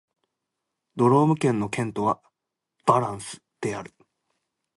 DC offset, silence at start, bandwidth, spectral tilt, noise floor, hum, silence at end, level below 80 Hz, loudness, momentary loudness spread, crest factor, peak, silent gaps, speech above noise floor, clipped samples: under 0.1%; 0.95 s; 11.5 kHz; -7 dB/octave; -84 dBFS; none; 0.95 s; -62 dBFS; -24 LUFS; 17 LU; 22 dB; -4 dBFS; none; 61 dB; under 0.1%